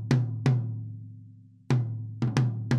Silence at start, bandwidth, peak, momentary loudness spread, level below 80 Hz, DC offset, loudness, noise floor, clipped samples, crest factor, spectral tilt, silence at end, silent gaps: 0 s; 9.6 kHz; -8 dBFS; 17 LU; -60 dBFS; under 0.1%; -29 LUFS; -51 dBFS; under 0.1%; 20 dB; -7.5 dB/octave; 0 s; none